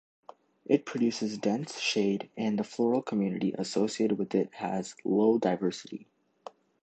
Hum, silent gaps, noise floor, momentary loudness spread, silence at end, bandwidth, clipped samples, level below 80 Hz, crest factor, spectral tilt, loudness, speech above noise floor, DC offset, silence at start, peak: none; none; -51 dBFS; 18 LU; 0.8 s; 9 kHz; under 0.1%; -74 dBFS; 20 dB; -5.5 dB/octave; -30 LUFS; 22 dB; under 0.1%; 0.7 s; -10 dBFS